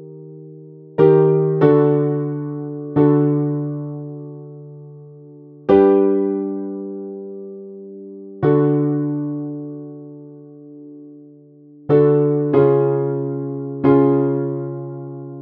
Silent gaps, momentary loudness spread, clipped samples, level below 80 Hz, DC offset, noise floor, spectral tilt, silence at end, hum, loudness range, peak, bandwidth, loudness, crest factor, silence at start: none; 23 LU; under 0.1%; -58 dBFS; under 0.1%; -45 dBFS; -12.5 dB/octave; 0 s; none; 6 LU; -2 dBFS; 4.3 kHz; -17 LUFS; 18 dB; 0 s